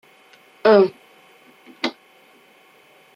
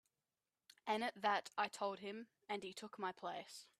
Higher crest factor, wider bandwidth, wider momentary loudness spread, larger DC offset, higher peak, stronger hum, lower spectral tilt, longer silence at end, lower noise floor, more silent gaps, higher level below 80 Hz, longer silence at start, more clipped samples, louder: about the same, 22 dB vs 22 dB; second, 7.4 kHz vs 14 kHz; about the same, 13 LU vs 12 LU; neither; first, -2 dBFS vs -24 dBFS; neither; first, -6 dB/octave vs -3 dB/octave; first, 1.25 s vs 0.15 s; second, -53 dBFS vs under -90 dBFS; neither; first, -72 dBFS vs under -90 dBFS; second, 0.65 s vs 0.85 s; neither; first, -19 LUFS vs -44 LUFS